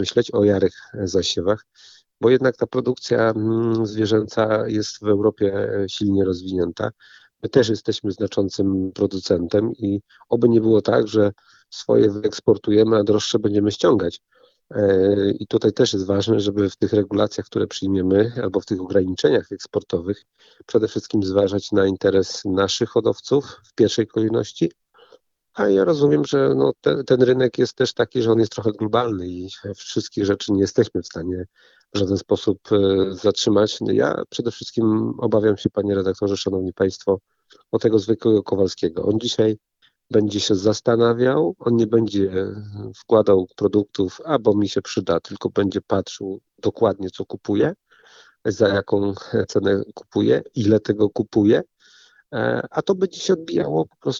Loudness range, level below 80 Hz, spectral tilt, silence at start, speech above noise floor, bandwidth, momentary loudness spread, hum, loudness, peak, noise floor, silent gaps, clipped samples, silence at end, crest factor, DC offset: 3 LU; -56 dBFS; -6 dB/octave; 0 s; 35 dB; 7.8 kHz; 9 LU; none; -20 LUFS; -2 dBFS; -55 dBFS; none; under 0.1%; 0 s; 18 dB; under 0.1%